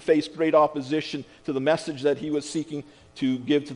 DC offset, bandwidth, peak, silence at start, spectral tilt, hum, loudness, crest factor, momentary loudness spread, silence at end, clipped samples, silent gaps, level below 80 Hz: under 0.1%; 10.5 kHz; -6 dBFS; 0 s; -5.5 dB/octave; none; -25 LUFS; 18 dB; 13 LU; 0 s; under 0.1%; none; -64 dBFS